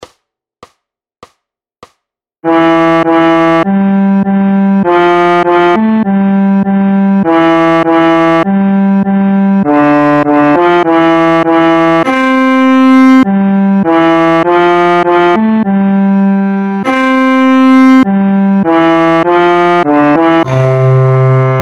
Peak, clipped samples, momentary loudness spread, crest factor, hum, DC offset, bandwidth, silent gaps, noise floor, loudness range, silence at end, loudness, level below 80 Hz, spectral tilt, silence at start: 0 dBFS; 0.9%; 3 LU; 8 dB; none; under 0.1%; 8 kHz; none; -70 dBFS; 2 LU; 0 s; -8 LUFS; -50 dBFS; -8 dB/octave; 0 s